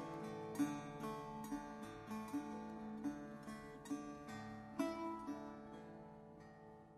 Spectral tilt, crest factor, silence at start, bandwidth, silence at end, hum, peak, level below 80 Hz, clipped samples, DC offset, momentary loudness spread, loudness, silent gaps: -6 dB/octave; 20 dB; 0 s; 13 kHz; 0 s; none; -28 dBFS; -72 dBFS; under 0.1%; under 0.1%; 14 LU; -48 LUFS; none